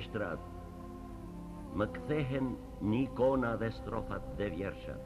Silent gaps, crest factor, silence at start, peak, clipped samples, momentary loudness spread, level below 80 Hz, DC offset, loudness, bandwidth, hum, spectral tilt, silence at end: none; 18 dB; 0 s; -18 dBFS; under 0.1%; 16 LU; -50 dBFS; under 0.1%; -36 LUFS; 13.5 kHz; none; -8 dB/octave; 0 s